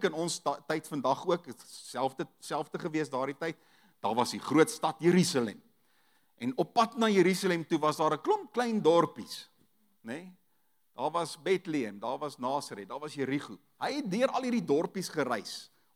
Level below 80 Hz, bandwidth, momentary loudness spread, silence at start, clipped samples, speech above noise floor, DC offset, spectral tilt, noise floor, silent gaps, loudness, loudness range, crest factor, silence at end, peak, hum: -88 dBFS; 16 kHz; 15 LU; 0 s; under 0.1%; 45 dB; under 0.1%; -5 dB/octave; -76 dBFS; none; -31 LUFS; 7 LU; 20 dB; 0.3 s; -12 dBFS; none